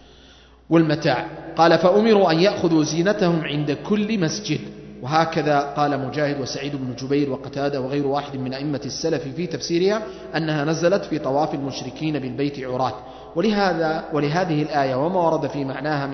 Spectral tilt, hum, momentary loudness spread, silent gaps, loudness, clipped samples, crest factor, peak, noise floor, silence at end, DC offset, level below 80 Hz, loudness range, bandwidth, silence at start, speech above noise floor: -6 dB/octave; none; 10 LU; none; -21 LUFS; under 0.1%; 18 dB; -2 dBFS; -49 dBFS; 0 s; under 0.1%; -52 dBFS; 6 LU; 6.4 kHz; 0.7 s; 28 dB